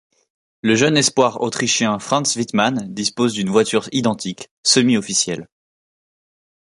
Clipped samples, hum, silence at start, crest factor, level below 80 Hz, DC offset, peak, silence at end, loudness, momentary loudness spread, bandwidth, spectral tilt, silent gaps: under 0.1%; none; 0.65 s; 18 dB; -60 dBFS; under 0.1%; 0 dBFS; 1.15 s; -18 LUFS; 8 LU; 11.5 kHz; -3.5 dB/octave; 4.51-4.63 s